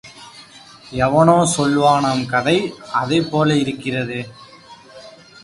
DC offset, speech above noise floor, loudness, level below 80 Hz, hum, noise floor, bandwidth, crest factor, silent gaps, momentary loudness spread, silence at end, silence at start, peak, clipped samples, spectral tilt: under 0.1%; 26 dB; -17 LUFS; -50 dBFS; none; -43 dBFS; 11.5 kHz; 18 dB; none; 17 LU; 0.35 s; 0.05 s; 0 dBFS; under 0.1%; -5 dB/octave